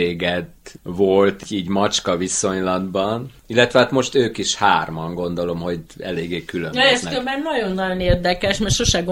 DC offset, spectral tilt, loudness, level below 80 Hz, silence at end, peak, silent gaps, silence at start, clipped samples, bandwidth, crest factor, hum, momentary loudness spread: under 0.1%; -4 dB/octave; -19 LUFS; -38 dBFS; 0 s; 0 dBFS; none; 0 s; under 0.1%; 16 kHz; 20 dB; none; 11 LU